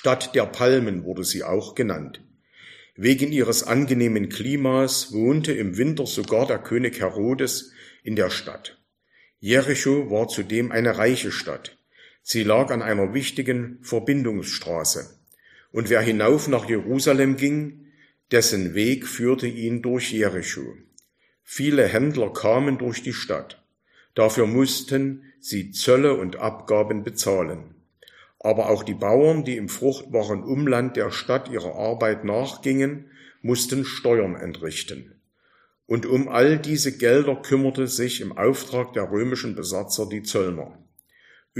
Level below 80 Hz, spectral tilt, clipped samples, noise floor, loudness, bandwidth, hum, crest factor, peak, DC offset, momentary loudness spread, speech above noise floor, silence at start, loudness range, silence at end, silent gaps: -62 dBFS; -4.5 dB/octave; under 0.1%; -63 dBFS; -23 LUFS; 15.5 kHz; none; 22 dB; -2 dBFS; under 0.1%; 11 LU; 41 dB; 0.05 s; 3 LU; 0 s; none